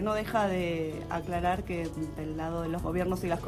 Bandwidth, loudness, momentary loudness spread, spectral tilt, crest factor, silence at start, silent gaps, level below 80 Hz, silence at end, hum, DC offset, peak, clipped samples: 16 kHz; -32 LUFS; 7 LU; -6.5 dB/octave; 16 dB; 0 s; none; -44 dBFS; 0 s; none; under 0.1%; -16 dBFS; under 0.1%